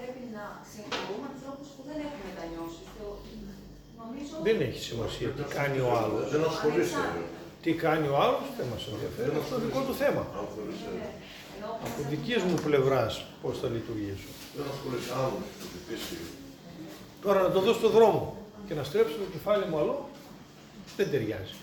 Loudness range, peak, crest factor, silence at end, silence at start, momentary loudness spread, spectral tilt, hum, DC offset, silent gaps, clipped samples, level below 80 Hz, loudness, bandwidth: 9 LU; -10 dBFS; 20 dB; 0 s; 0 s; 19 LU; -5.5 dB/octave; none; under 0.1%; none; under 0.1%; -56 dBFS; -30 LUFS; over 20 kHz